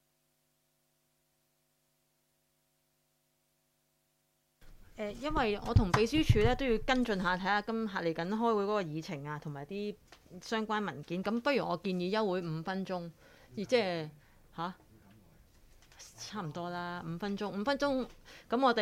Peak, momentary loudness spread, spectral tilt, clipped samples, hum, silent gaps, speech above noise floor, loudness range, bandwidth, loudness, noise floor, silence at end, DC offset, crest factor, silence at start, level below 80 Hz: -12 dBFS; 14 LU; -6 dB/octave; under 0.1%; none; none; 44 dB; 10 LU; 16 kHz; -34 LUFS; -77 dBFS; 0 s; under 0.1%; 22 dB; 4.65 s; -48 dBFS